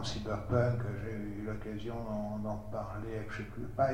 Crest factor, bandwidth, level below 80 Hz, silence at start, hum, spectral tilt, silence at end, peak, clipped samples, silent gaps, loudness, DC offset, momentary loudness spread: 18 dB; 11.5 kHz; -50 dBFS; 0 s; none; -7 dB/octave; 0 s; -16 dBFS; under 0.1%; none; -37 LUFS; 0.4%; 9 LU